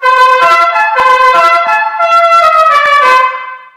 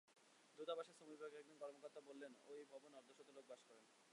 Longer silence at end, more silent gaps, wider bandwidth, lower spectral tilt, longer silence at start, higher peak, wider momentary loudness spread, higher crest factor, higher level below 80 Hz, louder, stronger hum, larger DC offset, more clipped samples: first, 0.2 s vs 0 s; neither; first, 15 kHz vs 11 kHz; second, -0.5 dB/octave vs -3 dB/octave; about the same, 0 s vs 0.05 s; first, 0 dBFS vs -36 dBFS; second, 4 LU vs 14 LU; second, 8 dB vs 22 dB; first, -52 dBFS vs under -90 dBFS; first, -6 LUFS vs -58 LUFS; neither; neither; neither